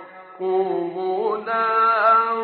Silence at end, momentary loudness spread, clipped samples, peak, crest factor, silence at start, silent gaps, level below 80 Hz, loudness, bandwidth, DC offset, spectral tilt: 0 s; 9 LU; under 0.1%; -6 dBFS; 14 dB; 0 s; none; -78 dBFS; -20 LUFS; 4.8 kHz; under 0.1%; -2.5 dB/octave